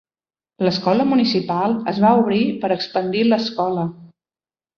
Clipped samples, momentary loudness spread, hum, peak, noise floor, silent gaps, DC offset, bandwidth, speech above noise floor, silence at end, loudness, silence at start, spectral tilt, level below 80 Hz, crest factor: under 0.1%; 6 LU; none; -2 dBFS; under -90 dBFS; none; under 0.1%; 6.8 kHz; over 72 dB; 0.7 s; -19 LUFS; 0.6 s; -7 dB/octave; -60 dBFS; 16 dB